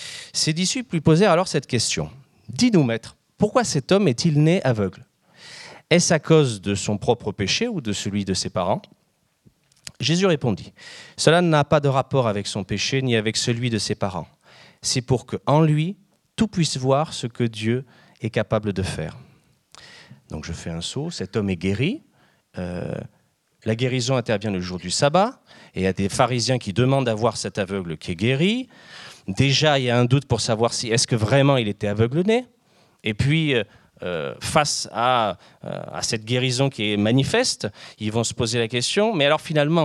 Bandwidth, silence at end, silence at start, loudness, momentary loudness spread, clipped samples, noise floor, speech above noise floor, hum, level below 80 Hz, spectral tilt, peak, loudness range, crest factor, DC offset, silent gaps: 12.5 kHz; 0 s; 0 s; -21 LUFS; 14 LU; under 0.1%; -66 dBFS; 45 dB; none; -52 dBFS; -5 dB/octave; 0 dBFS; 7 LU; 22 dB; under 0.1%; none